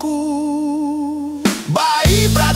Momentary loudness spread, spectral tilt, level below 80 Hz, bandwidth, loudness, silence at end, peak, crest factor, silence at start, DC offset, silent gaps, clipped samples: 8 LU; -4.5 dB/octave; -28 dBFS; 16.5 kHz; -17 LUFS; 0 s; -2 dBFS; 14 dB; 0 s; under 0.1%; none; under 0.1%